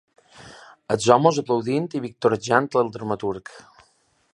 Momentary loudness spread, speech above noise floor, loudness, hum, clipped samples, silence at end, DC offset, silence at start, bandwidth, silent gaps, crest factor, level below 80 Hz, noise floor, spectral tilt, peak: 13 LU; 41 dB; -22 LUFS; none; under 0.1%; 0.75 s; under 0.1%; 0.4 s; 11 kHz; none; 22 dB; -62 dBFS; -63 dBFS; -5.5 dB/octave; 0 dBFS